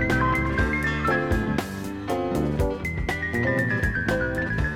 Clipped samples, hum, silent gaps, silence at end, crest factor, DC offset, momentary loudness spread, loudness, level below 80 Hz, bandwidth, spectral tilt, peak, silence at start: under 0.1%; none; none; 0 s; 16 dB; under 0.1%; 5 LU; -25 LUFS; -34 dBFS; 17 kHz; -6.5 dB/octave; -10 dBFS; 0 s